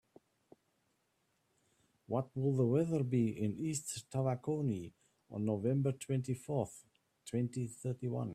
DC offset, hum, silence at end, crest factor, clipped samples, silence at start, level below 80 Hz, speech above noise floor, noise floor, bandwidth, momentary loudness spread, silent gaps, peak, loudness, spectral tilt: under 0.1%; none; 0 s; 18 dB; under 0.1%; 2.1 s; -72 dBFS; 44 dB; -79 dBFS; 14.5 kHz; 9 LU; none; -20 dBFS; -37 LUFS; -7 dB/octave